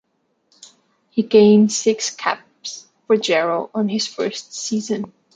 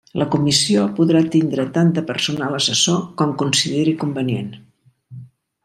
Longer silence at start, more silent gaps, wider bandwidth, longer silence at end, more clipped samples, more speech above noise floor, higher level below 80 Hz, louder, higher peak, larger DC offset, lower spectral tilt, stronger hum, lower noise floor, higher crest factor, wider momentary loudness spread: first, 1.15 s vs 0.15 s; neither; second, 9.2 kHz vs 13.5 kHz; about the same, 0.3 s vs 0.4 s; neither; first, 50 dB vs 24 dB; second, -66 dBFS vs -58 dBFS; about the same, -18 LUFS vs -18 LUFS; about the same, -2 dBFS vs -2 dBFS; neither; about the same, -4.5 dB/octave vs -4.5 dB/octave; neither; first, -68 dBFS vs -42 dBFS; about the same, 18 dB vs 16 dB; first, 15 LU vs 7 LU